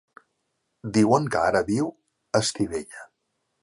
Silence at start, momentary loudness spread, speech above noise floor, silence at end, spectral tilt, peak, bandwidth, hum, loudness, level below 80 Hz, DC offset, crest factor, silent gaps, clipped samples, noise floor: 0.85 s; 17 LU; 53 dB; 0.55 s; -5 dB/octave; -6 dBFS; 11.5 kHz; none; -24 LUFS; -56 dBFS; under 0.1%; 20 dB; none; under 0.1%; -76 dBFS